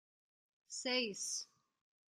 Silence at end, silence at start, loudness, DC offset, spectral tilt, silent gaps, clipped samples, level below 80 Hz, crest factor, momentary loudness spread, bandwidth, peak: 0.65 s; 0.7 s; -39 LUFS; under 0.1%; -0.5 dB/octave; none; under 0.1%; under -90 dBFS; 22 dB; 12 LU; 13.5 kHz; -22 dBFS